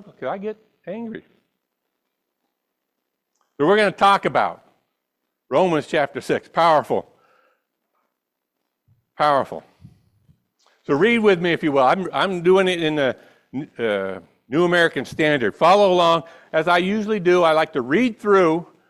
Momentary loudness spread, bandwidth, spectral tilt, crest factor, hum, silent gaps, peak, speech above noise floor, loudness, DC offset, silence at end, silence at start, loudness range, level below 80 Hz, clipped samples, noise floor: 16 LU; 13 kHz; -5.5 dB/octave; 16 dB; none; none; -4 dBFS; 60 dB; -19 LUFS; under 0.1%; 0.25 s; 0.2 s; 10 LU; -62 dBFS; under 0.1%; -79 dBFS